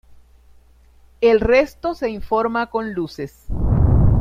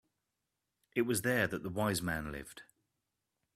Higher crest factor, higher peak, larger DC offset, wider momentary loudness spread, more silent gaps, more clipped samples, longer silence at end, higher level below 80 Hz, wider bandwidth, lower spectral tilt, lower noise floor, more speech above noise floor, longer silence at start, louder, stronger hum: second, 16 dB vs 22 dB; first, -4 dBFS vs -16 dBFS; neither; second, 12 LU vs 15 LU; neither; neither; second, 0 s vs 0.95 s; first, -26 dBFS vs -62 dBFS; second, 14.5 kHz vs 16 kHz; first, -8.5 dB/octave vs -4.5 dB/octave; second, -50 dBFS vs -87 dBFS; second, 31 dB vs 52 dB; second, 0.1 s vs 0.95 s; first, -19 LUFS vs -35 LUFS; neither